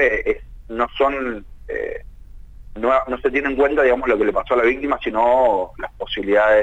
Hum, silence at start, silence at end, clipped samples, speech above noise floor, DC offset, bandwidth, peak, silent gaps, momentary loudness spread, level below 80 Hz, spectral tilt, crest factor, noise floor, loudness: none; 0 s; 0 s; under 0.1%; 20 dB; under 0.1%; 8 kHz; -6 dBFS; none; 14 LU; -40 dBFS; -6 dB/octave; 14 dB; -38 dBFS; -19 LUFS